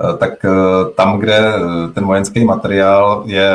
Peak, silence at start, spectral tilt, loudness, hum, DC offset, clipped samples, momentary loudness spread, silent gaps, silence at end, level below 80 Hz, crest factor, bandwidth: 0 dBFS; 0 s; -6 dB/octave; -12 LUFS; none; under 0.1%; under 0.1%; 5 LU; none; 0 s; -46 dBFS; 12 dB; 10.5 kHz